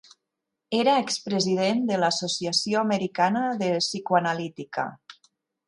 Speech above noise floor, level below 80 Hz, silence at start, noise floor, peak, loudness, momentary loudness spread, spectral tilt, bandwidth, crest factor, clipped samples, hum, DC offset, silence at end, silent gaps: 59 dB; -72 dBFS; 0.7 s; -83 dBFS; -8 dBFS; -25 LUFS; 9 LU; -4 dB/octave; 11.5 kHz; 18 dB; under 0.1%; none; under 0.1%; 0.55 s; none